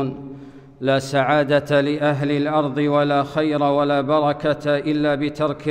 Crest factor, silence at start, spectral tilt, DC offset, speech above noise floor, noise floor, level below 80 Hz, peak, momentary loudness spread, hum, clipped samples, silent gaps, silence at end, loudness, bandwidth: 14 dB; 0 s; -7 dB/octave; under 0.1%; 20 dB; -39 dBFS; -54 dBFS; -4 dBFS; 5 LU; none; under 0.1%; none; 0 s; -20 LUFS; 10 kHz